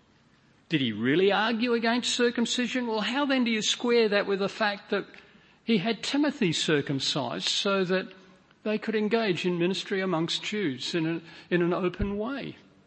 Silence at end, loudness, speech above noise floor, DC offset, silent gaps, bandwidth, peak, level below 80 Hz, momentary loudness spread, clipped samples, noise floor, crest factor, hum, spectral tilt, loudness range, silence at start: 0.3 s; -27 LUFS; 34 dB; under 0.1%; none; 8.8 kHz; -10 dBFS; -52 dBFS; 8 LU; under 0.1%; -61 dBFS; 18 dB; none; -4 dB/octave; 3 LU; 0.7 s